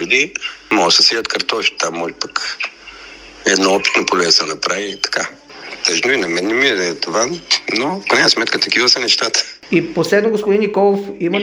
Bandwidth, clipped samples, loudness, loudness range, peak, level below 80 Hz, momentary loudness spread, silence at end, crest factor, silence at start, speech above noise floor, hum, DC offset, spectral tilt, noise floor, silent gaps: over 20 kHz; under 0.1%; -15 LUFS; 3 LU; 0 dBFS; -56 dBFS; 10 LU; 0 s; 16 dB; 0 s; 21 dB; none; under 0.1%; -2 dB/octave; -37 dBFS; none